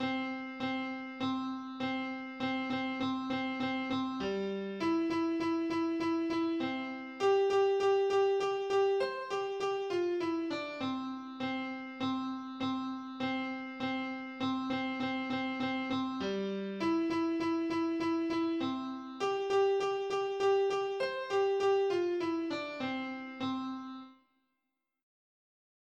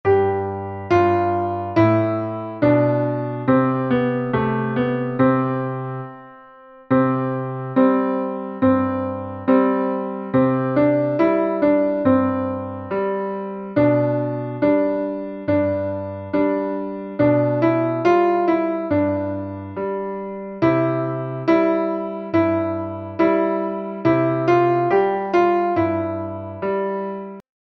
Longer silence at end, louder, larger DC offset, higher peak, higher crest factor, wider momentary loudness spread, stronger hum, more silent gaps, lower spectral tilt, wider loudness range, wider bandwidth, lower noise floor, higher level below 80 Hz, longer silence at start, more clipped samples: first, 1.85 s vs 0.3 s; second, -34 LUFS vs -20 LUFS; neither; second, -20 dBFS vs -4 dBFS; about the same, 14 dB vs 16 dB; about the same, 9 LU vs 10 LU; neither; neither; second, -5.5 dB/octave vs -9.5 dB/octave; first, 6 LU vs 3 LU; first, 8.8 kHz vs 6.2 kHz; first, -86 dBFS vs -45 dBFS; second, -72 dBFS vs -56 dBFS; about the same, 0 s vs 0.05 s; neither